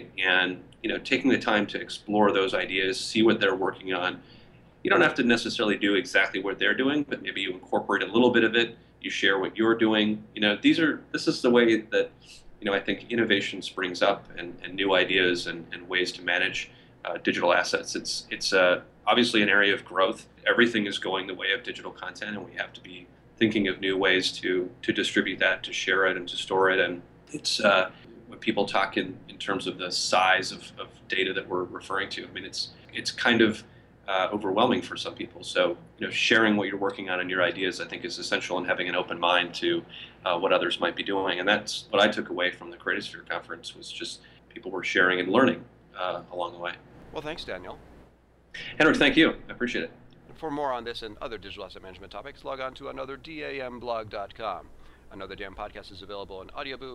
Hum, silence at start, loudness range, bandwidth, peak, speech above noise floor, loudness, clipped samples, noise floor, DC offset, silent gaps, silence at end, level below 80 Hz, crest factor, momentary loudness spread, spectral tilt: none; 0 s; 6 LU; 12 kHz; -8 dBFS; 32 dB; -26 LUFS; under 0.1%; -58 dBFS; under 0.1%; none; 0 s; -58 dBFS; 20 dB; 16 LU; -3.5 dB/octave